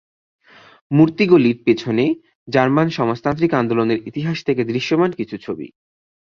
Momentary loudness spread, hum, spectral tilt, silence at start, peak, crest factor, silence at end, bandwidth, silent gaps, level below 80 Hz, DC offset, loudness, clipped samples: 14 LU; none; -7.5 dB/octave; 0.9 s; -2 dBFS; 16 dB; 0.7 s; 6.8 kHz; 2.35-2.46 s; -56 dBFS; under 0.1%; -18 LUFS; under 0.1%